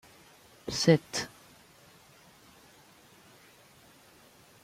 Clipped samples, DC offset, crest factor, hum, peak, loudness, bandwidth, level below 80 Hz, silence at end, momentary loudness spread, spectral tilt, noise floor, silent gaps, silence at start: under 0.1%; under 0.1%; 26 dB; none; -8 dBFS; -28 LUFS; 16 kHz; -66 dBFS; 3.35 s; 18 LU; -5 dB/octave; -58 dBFS; none; 0.65 s